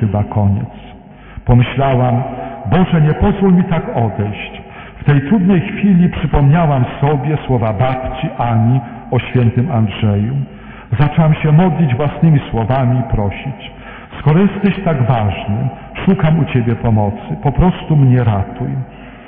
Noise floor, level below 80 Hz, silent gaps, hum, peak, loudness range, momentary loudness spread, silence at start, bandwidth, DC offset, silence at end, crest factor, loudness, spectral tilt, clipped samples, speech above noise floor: -35 dBFS; -30 dBFS; none; none; 0 dBFS; 2 LU; 11 LU; 0 s; 3.7 kHz; under 0.1%; 0 s; 12 dB; -14 LUFS; -12.5 dB/octave; under 0.1%; 23 dB